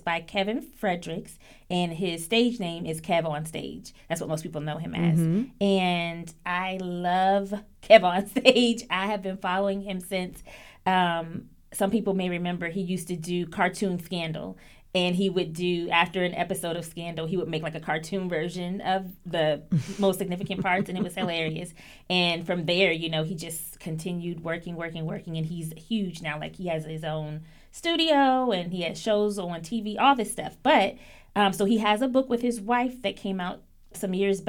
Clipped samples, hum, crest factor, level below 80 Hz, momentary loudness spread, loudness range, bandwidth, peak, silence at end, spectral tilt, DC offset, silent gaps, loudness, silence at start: under 0.1%; none; 26 dB; -54 dBFS; 12 LU; 6 LU; 19 kHz; 0 dBFS; 0 s; -5 dB/octave; under 0.1%; none; -27 LUFS; 0.05 s